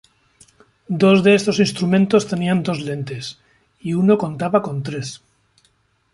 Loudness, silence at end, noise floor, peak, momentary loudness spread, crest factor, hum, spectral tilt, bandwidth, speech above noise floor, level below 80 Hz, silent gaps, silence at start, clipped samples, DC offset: -18 LUFS; 0.95 s; -62 dBFS; -2 dBFS; 16 LU; 18 dB; none; -6 dB/octave; 11.5 kHz; 44 dB; -58 dBFS; none; 0.9 s; under 0.1%; under 0.1%